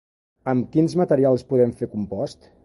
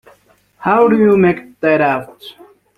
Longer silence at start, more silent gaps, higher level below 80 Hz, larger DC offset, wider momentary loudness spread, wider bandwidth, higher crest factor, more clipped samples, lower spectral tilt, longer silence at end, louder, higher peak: second, 0.45 s vs 0.6 s; neither; about the same, -56 dBFS vs -54 dBFS; neither; about the same, 11 LU vs 12 LU; second, 11.5 kHz vs 13 kHz; about the same, 16 dB vs 14 dB; neither; about the same, -8.5 dB/octave vs -8.5 dB/octave; second, 0.3 s vs 0.45 s; second, -22 LUFS vs -13 LUFS; second, -6 dBFS vs -2 dBFS